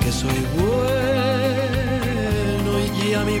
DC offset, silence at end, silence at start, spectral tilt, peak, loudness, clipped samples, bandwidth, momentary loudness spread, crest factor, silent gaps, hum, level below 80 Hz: under 0.1%; 0 s; 0 s; -5.5 dB/octave; -8 dBFS; -21 LUFS; under 0.1%; 17 kHz; 2 LU; 12 dB; none; none; -32 dBFS